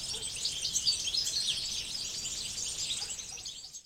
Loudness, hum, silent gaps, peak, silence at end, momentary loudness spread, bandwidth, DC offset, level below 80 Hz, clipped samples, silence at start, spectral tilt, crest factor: -32 LUFS; none; none; -16 dBFS; 0.05 s; 9 LU; 16 kHz; under 0.1%; -58 dBFS; under 0.1%; 0 s; 1 dB/octave; 20 dB